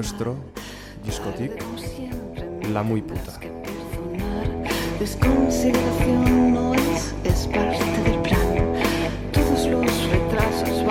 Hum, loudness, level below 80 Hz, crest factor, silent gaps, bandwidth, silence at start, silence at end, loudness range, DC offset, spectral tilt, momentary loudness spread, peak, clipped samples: none; -23 LUFS; -32 dBFS; 16 dB; none; 16.5 kHz; 0 s; 0 s; 9 LU; under 0.1%; -6 dB/octave; 13 LU; -6 dBFS; under 0.1%